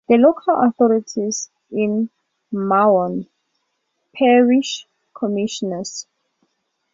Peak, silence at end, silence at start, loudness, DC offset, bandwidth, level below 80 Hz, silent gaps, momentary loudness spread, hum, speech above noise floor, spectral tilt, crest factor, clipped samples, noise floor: -2 dBFS; 0.9 s; 0.1 s; -18 LUFS; under 0.1%; 7.8 kHz; -66 dBFS; none; 14 LU; none; 55 dB; -5 dB/octave; 18 dB; under 0.1%; -72 dBFS